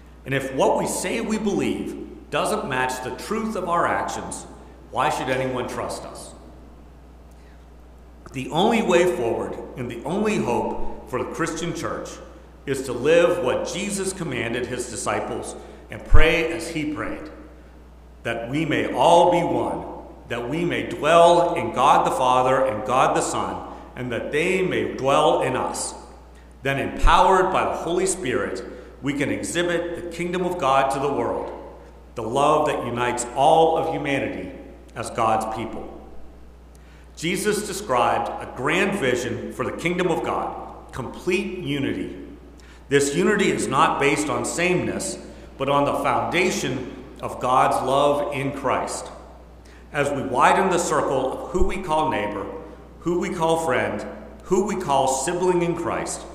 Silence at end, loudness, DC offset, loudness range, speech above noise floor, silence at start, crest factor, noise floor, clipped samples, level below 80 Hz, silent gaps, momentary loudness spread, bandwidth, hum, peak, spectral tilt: 0 s; -22 LUFS; under 0.1%; 7 LU; 24 dB; 0 s; 22 dB; -45 dBFS; under 0.1%; -34 dBFS; none; 16 LU; 15.5 kHz; none; 0 dBFS; -4.5 dB/octave